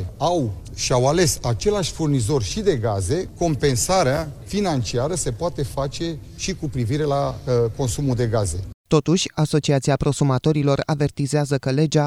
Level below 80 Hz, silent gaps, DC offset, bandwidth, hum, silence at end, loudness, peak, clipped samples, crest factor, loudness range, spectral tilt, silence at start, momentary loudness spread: -38 dBFS; 8.74-8.84 s; under 0.1%; 14.5 kHz; none; 0 s; -21 LUFS; -2 dBFS; under 0.1%; 18 dB; 3 LU; -5.5 dB/octave; 0 s; 7 LU